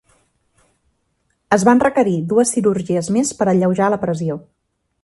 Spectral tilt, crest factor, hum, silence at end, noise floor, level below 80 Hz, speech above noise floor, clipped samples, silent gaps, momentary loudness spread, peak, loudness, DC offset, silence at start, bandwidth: -6 dB/octave; 18 dB; none; 0.65 s; -67 dBFS; -54 dBFS; 51 dB; under 0.1%; none; 8 LU; 0 dBFS; -17 LUFS; under 0.1%; 1.5 s; 11.5 kHz